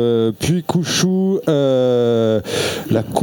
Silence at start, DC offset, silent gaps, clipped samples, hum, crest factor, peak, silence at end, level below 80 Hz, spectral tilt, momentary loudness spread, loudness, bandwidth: 0 s; under 0.1%; none; under 0.1%; none; 14 dB; -4 dBFS; 0 s; -48 dBFS; -5.5 dB/octave; 5 LU; -17 LUFS; 19 kHz